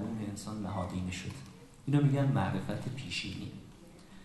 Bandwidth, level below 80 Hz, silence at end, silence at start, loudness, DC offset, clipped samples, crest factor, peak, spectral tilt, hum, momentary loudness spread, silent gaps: 12.5 kHz; -54 dBFS; 0 s; 0 s; -34 LUFS; under 0.1%; under 0.1%; 18 dB; -16 dBFS; -6.5 dB/octave; none; 22 LU; none